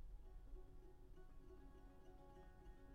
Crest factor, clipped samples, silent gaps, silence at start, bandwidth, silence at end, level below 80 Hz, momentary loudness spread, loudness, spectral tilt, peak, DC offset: 14 dB; under 0.1%; none; 0 s; 9 kHz; 0 s; -60 dBFS; 3 LU; -66 LUFS; -7 dB/octave; -46 dBFS; under 0.1%